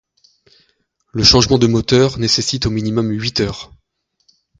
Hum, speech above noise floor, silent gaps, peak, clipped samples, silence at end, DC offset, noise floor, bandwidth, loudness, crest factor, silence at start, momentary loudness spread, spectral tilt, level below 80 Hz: none; 49 dB; none; 0 dBFS; under 0.1%; 0.95 s; under 0.1%; -64 dBFS; 9.4 kHz; -14 LUFS; 18 dB; 1.15 s; 11 LU; -4.5 dB/octave; -36 dBFS